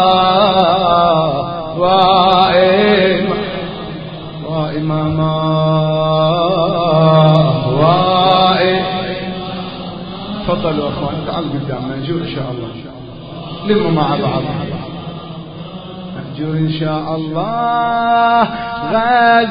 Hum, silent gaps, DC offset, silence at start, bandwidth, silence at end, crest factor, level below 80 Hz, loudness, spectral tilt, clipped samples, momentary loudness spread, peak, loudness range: none; none; under 0.1%; 0 s; 5.2 kHz; 0 s; 14 dB; -42 dBFS; -14 LUFS; -9 dB/octave; under 0.1%; 17 LU; 0 dBFS; 9 LU